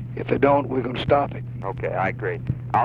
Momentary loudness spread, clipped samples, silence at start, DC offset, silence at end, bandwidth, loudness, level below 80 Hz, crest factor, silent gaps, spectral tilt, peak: 10 LU; under 0.1%; 0 s; under 0.1%; 0 s; 5.4 kHz; -23 LUFS; -44 dBFS; 18 dB; none; -9 dB/octave; -6 dBFS